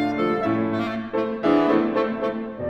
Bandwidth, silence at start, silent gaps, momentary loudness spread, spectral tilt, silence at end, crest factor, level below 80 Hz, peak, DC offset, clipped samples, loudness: 7.4 kHz; 0 s; none; 7 LU; -8 dB/octave; 0 s; 14 dB; -54 dBFS; -8 dBFS; under 0.1%; under 0.1%; -23 LUFS